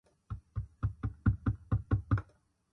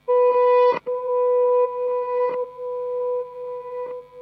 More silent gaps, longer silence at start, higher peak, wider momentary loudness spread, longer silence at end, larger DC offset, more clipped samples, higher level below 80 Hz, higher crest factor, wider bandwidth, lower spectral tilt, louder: neither; first, 0.3 s vs 0.1 s; second, -16 dBFS vs -8 dBFS; second, 11 LU vs 15 LU; first, 0.5 s vs 0 s; neither; neither; first, -42 dBFS vs -70 dBFS; first, 20 dB vs 12 dB; second, 4 kHz vs 5.2 kHz; first, -10.5 dB/octave vs -6 dB/octave; second, -35 LUFS vs -21 LUFS